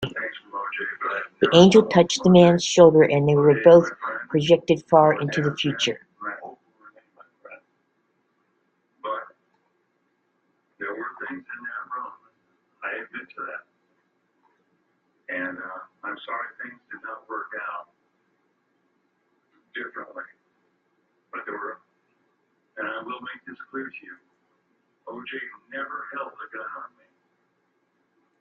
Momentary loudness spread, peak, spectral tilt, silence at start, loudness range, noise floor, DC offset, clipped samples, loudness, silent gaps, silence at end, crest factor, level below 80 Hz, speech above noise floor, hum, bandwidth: 23 LU; -2 dBFS; -5.5 dB/octave; 0 s; 24 LU; -71 dBFS; under 0.1%; under 0.1%; -20 LUFS; none; 1.55 s; 22 dB; -62 dBFS; 51 dB; none; 8.8 kHz